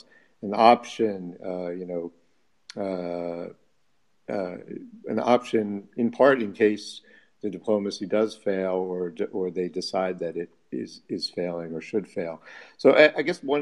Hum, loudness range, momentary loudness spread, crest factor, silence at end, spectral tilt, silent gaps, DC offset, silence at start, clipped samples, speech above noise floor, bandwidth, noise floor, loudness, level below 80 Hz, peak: none; 9 LU; 17 LU; 24 dB; 0 s; -5.5 dB/octave; none; under 0.1%; 0.4 s; under 0.1%; 48 dB; 11.5 kHz; -73 dBFS; -26 LUFS; -74 dBFS; -2 dBFS